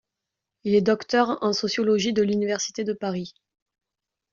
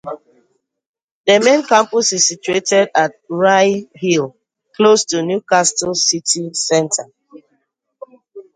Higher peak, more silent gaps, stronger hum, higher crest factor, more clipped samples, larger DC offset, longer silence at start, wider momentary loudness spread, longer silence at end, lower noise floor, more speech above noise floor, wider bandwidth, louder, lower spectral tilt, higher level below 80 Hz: second, -6 dBFS vs 0 dBFS; second, none vs 0.86-0.94 s, 1.02-1.24 s; neither; about the same, 18 dB vs 16 dB; neither; neither; first, 0.65 s vs 0.05 s; about the same, 9 LU vs 8 LU; first, 1 s vs 0.15 s; about the same, -86 dBFS vs -84 dBFS; second, 63 dB vs 69 dB; second, 7.4 kHz vs 10 kHz; second, -24 LUFS vs -14 LUFS; first, -4 dB/octave vs -2.5 dB/octave; about the same, -66 dBFS vs -64 dBFS